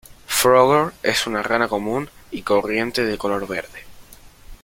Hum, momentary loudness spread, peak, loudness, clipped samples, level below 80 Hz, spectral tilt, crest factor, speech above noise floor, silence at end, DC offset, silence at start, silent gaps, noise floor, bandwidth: none; 14 LU; -2 dBFS; -19 LUFS; under 0.1%; -48 dBFS; -3.5 dB/octave; 20 dB; 24 dB; 0.1 s; under 0.1%; 0.3 s; none; -44 dBFS; 17 kHz